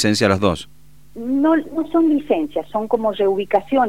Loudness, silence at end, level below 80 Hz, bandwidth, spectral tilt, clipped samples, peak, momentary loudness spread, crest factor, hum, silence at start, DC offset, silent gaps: -19 LUFS; 0 s; -50 dBFS; 15 kHz; -5.5 dB/octave; under 0.1%; -2 dBFS; 7 LU; 18 dB; 50 Hz at -50 dBFS; 0 s; 0.9%; none